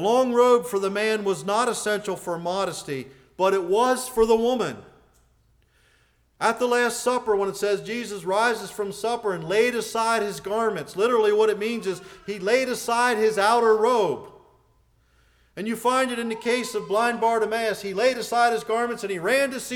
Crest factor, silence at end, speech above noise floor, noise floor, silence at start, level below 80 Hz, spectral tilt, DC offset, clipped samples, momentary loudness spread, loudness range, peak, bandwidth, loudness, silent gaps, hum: 16 dB; 0 s; 40 dB; -63 dBFS; 0 s; -58 dBFS; -3.5 dB/octave; under 0.1%; under 0.1%; 10 LU; 3 LU; -8 dBFS; 19 kHz; -23 LUFS; none; none